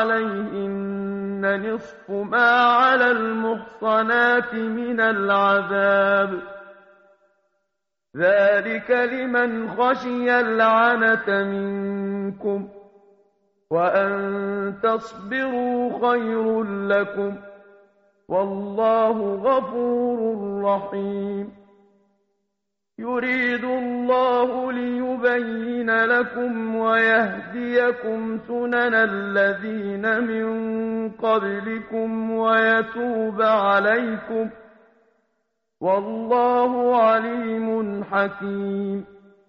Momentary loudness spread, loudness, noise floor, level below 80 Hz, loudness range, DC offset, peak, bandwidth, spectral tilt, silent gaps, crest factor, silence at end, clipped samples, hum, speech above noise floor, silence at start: 10 LU; -21 LUFS; -81 dBFS; -64 dBFS; 5 LU; under 0.1%; -4 dBFS; 6.6 kHz; -3.5 dB/octave; none; 18 dB; 0.45 s; under 0.1%; none; 60 dB; 0 s